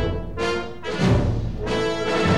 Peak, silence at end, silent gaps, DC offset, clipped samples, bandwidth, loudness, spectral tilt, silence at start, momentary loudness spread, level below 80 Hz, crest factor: -8 dBFS; 0 s; none; 1%; under 0.1%; 11.5 kHz; -23 LUFS; -6 dB/octave; 0 s; 7 LU; -34 dBFS; 14 dB